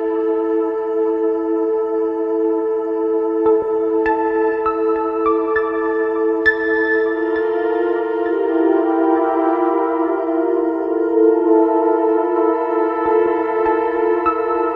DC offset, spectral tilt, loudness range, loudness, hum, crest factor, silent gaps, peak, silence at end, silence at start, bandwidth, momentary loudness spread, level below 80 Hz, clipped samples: under 0.1%; -7.5 dB/octave; 2 LU; -17 LUFS; none; 14 dB; none; -2 dBFS; 0 s; 0 s; 5.6 kHz; 4 LU; -54 dBFS; under 0.1%